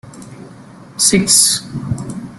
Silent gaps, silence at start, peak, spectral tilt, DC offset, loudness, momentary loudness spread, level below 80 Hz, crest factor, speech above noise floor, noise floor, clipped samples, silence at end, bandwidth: none; 0.05 s; 0 dBFS; -2.5 dB/octave; under 0.1%; -12 LUFS; 15 LU; -46 dBFS; 18 dB; 24 dB; -38 dBFS; under 0.1%; 0 s; over 20 kHz